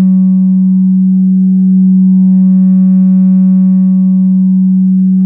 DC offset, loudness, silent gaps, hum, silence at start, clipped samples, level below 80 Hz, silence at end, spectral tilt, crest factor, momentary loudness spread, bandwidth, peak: under 0.1%; -8 LUFS; none; none; 0 s; under 0.1%; -58 dBFS; 0 s; -14.5 dB/octave; 4 dB; 2 LU; 1.2 kHz; -2 dBFS